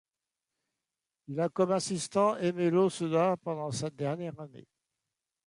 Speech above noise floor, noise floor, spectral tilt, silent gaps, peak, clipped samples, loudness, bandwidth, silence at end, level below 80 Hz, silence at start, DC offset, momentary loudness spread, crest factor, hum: 60 dB; -90 dBFS; -5.5 dB/octave; none; -14 dBFS; under 0.1%; -30 LUFS; 11.5 kHz; 0.9 s; -72 dBFS; 1.3 s; under 0.1%; 12 LU; 18 dB; none